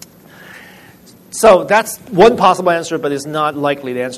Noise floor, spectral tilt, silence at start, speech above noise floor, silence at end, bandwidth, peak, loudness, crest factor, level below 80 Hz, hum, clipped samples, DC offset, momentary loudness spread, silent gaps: -42 dBFS; -4.5 dB/octave; 0.45 s; 29 dB; 0 s; 14 kHz; 0 dBFS; -13 LUFS; 14 dB; -48 dBFS; none; under 0.1%; under 0.1%; 11 LU; none